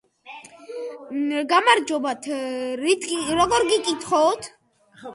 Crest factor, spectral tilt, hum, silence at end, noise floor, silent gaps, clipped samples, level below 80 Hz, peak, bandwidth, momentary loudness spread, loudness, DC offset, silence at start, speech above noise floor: 22 dB; -2.5 dB/octave; none; 0 s; -44 dBFS; none; under 0.1%; -58 dBFS; -2 dBFS; 11.5 kHz; 22 LU; -21 LUFS; under 0.1%; 0.25 s; 23 dB